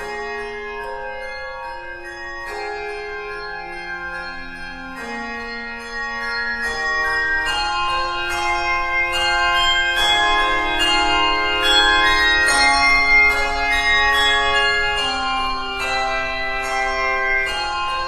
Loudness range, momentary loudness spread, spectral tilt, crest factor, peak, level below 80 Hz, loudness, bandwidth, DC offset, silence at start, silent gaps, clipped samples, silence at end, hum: 14 LU; 16 LU; -1.5 dB/octave; 16 dB; -2 dBFS; -34 dBFS; -17 LUFS; 13.5 kHz; under 0.1%; 0 s; none; under 0.1%; 0 s; none